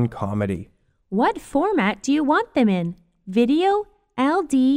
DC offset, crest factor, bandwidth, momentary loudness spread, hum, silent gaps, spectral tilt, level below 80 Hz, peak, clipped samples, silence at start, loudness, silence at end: under 0.1%; 14 dB; 12 kHz; 9 LU; none; none; -6.5 dB/octave; -52 dBFS; -6 dBFS; under 0.1%; 0 s; -21 LUFS; 0 s